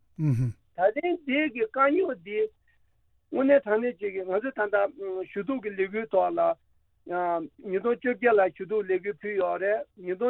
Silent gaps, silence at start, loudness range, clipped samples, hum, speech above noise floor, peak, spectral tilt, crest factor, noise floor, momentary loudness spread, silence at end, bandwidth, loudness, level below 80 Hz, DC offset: none; 0.2 s; 2 LU; under 0.1%; none; 40 dB; -10 dBFS; -9 dB/octave; 16 dB; -66 dBFS; 10 LU; 0 s; 6.2 kHz; -27 LUFS; -66 dBFS; under 0.1%